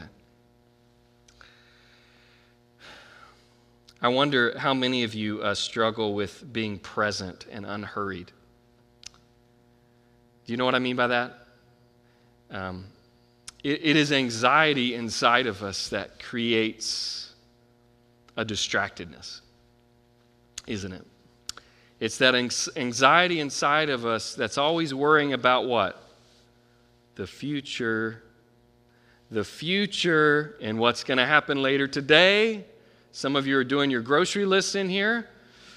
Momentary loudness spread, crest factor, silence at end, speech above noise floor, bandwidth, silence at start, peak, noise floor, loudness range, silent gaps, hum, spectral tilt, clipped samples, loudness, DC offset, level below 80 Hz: 17 LU; 26 dB; 0 s; 36 dB; 13.5 kHz; 0 s; 0 dBFS; -61 dBFS; 11 LU; none; none; -3.5 dB/octave; under 0.1%; -24 LUFS; under 0.1%; -66 dBFS